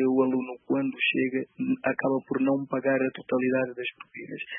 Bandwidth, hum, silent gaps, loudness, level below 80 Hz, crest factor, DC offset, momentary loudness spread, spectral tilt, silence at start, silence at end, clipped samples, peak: 3.7 kHz; none; none; -27 LUFS; -76 dBFS; 16 dB; under 0.1%; 10 LU; -10 dB/octave; 0 s; 0 s; under 0.1%; -12 dBFS